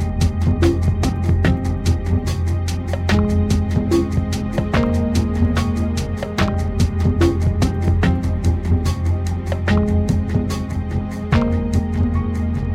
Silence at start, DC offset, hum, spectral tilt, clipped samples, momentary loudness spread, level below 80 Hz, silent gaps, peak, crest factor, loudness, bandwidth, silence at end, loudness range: 0 s; under 0.1%; none; -7 dB/octave; under 0.1%; 5 LU; -26 dBFS; none; -4 dBFS; 14 dB; -19 LUFS; 12 kHz; 0 s; 1 LU